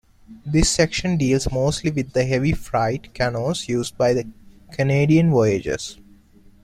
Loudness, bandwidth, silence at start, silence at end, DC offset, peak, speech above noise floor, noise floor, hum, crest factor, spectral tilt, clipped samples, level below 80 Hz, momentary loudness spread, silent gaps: -20 LUFS; 14 kHz; 0.3 s; 0.7 s; under 0.1%; -2 dBFS; 30 dB; -50 dBFS; none; 18 dB; -5.5 dB/octave; under 0.1%; -36 dBFS; 9 LU; none